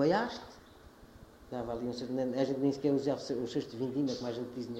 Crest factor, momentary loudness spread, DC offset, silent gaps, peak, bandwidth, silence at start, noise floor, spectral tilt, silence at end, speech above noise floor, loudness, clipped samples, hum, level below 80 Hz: 18 dB; 11 LU; under 0.1%; none; -16 dBFS; 12.5 kHz; 0 s; -56 dBFS; -6.5 dB/octave; 0 s; 22 dB; -34 LUFS; under 0.1%; none; -64 dBFS